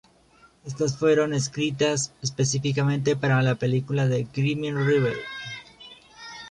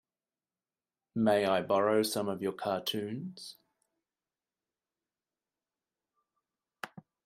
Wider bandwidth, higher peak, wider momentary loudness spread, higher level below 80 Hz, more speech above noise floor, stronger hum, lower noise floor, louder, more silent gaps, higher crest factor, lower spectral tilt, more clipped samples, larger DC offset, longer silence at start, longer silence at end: second, 10.5 kHz vs 15.5 kHz; first, -10 dBFS vs -14 dBFS; about the same, 18 LU vs 19 LU; first, -58 dBFS vs -78 dBFS; second, 33 dB vs over 59 dB; neither; second, -57 dBFS vs under -90 dBFS; first, -24 LUFS vs -31 LUFS; neither; second, 14 dB vs 20 dB; about the same, -5.5 dB/octave vs -4.5 dB/octave; neither; neither; second, 0.65 s vs 1.15 s; second, 0 s vs 0.25 s